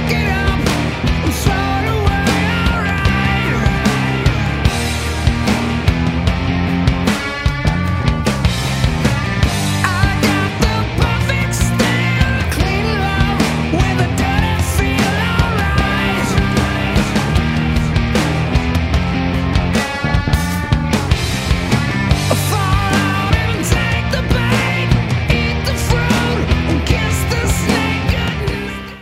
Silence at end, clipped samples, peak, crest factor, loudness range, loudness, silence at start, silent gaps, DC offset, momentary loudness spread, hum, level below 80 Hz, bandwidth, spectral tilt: 0 s; under 0.1%; 0 dBFS; 14 dB; 1 LU; -16 LUFS; 0 s; none; under 0.1%; 2 LU; none; -22 dBFS; 16 kHz; -5.5 dB/octave